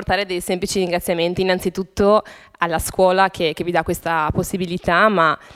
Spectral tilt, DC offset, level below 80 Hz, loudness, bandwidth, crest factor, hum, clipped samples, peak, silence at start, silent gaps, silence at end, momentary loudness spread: -4.5 dB/octave; under 0.1%; -40 dBFS; -19 LUFS; 16 kHz; 18 dB; none; under 0.1%; 0 dBFS; 0 s; none; 0.1 s; 7 LU